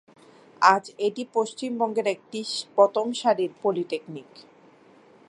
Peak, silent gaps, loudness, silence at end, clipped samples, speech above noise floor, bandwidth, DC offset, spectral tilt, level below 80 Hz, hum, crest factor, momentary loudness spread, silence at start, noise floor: -2 dBFS; none; -25 LUFS; 0.9 s; under 0.1%; 30 dB; 11.5 kHz; under 0.1%; -4 dB/octave; -82 dBFS; none; 24 dB; 12 LU; 0.6 s; -54 dBFS